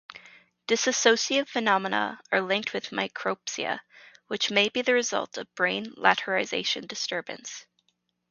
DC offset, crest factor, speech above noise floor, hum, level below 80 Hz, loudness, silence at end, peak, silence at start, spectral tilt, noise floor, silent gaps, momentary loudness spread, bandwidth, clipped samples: under 0.1%; 26 dB; 47 dB; none; -76 dBFS; -26 LUFS; 0.7 s; -2 dBFS; 0.1 s; -2 dB/octave; -74 dBFS; none; 14 LU; 7.4 kHz; under 0.1%